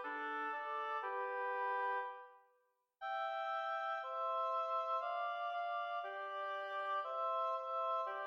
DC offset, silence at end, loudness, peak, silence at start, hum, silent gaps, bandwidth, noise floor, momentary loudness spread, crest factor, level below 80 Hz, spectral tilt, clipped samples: under 0.1%; 0 s; -40 LUFS; -28 dBFS; 0 s; none; none; 7 kHz; -79 dBFS; 5 LU; 12 dB; under -90 dBFS; -1 dB/octave; under 0.1%